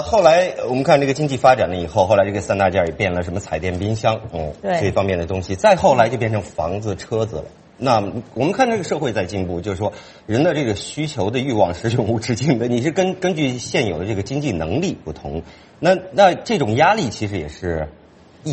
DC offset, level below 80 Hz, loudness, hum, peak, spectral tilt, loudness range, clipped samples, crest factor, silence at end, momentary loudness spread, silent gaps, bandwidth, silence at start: under 0.1%; -44 dBFS; -19 LUFS; none; 0 dBFS; -6 dB/octave; 4 LU; under 0.1%; 18 dB; 0 s; 11 LU; none; 8.8 kHz; 0 s